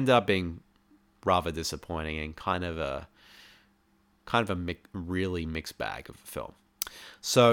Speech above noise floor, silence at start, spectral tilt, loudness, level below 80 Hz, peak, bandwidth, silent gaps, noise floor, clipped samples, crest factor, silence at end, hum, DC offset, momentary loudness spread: 38 dB; 0 s; -4.5 dB/octave; -31 LUFS; -50 dBFS; -8 dBFS; 19 kHz; none; -67 dBFS; under 0.1%; 22 dB; 0 s; none; under 0.1%; 13 LU